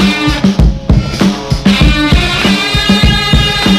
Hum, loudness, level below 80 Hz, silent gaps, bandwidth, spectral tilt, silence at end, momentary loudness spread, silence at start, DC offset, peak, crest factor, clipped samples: none; -10 LUFS; -16 dBFS; none; 14.5 kHz; -5 dB/octave; 0 s; 4 LU; 0 s; under 0.1%; 0 dBFS; 10 dB; 0.9%